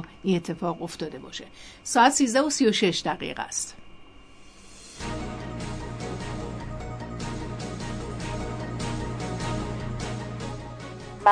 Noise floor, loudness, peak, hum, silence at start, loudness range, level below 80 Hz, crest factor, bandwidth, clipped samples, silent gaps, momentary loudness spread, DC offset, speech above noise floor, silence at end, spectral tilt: -48 dBFS; -28 LUFS; -6 dBFS; none; 0 s; 11 LU; -44 dBFS; 22 dB; 11 kHz; under 0.1%; none; 17 LU; under 0.1%; 23 dB; 0 s; -4 dB/octave